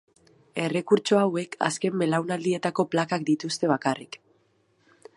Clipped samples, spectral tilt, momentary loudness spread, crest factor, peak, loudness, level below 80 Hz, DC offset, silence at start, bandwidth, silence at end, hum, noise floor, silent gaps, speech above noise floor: under 0.1%; -5 dB/octave; 9 LU; 20 dB; -6 dBFS; -26 LUFS; -74 dBFS; under 0.1%; 0.55 s; 11.5 kHz; 1 s; none; -66 dBFS; none; 41 dB